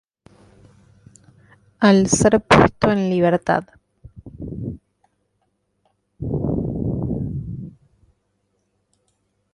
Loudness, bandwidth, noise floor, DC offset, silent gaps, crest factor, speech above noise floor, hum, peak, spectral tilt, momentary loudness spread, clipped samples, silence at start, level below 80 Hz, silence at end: -18 LUFS; 11.5 kHz; -70 dBFS; under 0.1%; none; 20 dB; 54 dB; 50 Hz at -45 dBFS; -2 dBFS; -5.5 dB/octave; 20 LU; under 0.1%; 1.8 s; -42 dBFS; 1.85 s